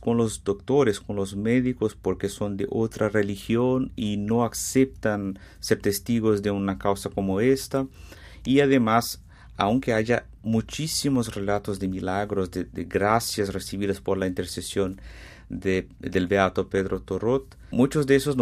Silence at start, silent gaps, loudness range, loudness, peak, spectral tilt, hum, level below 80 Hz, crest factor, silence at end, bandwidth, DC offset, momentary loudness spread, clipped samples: 0 s; none; 3 LU; -25 LUFS; -4 dBFS; -5.5 dB/octave; none; -48 dBFS; 20 dB; 0 s; 15.5 kHz; under 0.1%; 8 LU; under 0.1%